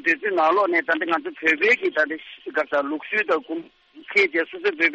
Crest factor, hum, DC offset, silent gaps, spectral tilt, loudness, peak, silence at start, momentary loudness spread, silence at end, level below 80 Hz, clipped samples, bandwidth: 16 dB; none; under 0.1%; none; -3.5 dB/octave; -21 LUFS; -6 dBFS; 0.05 s; 8 LU; 0 s; -72 dBFS; under 0.1%; 8.2 kHz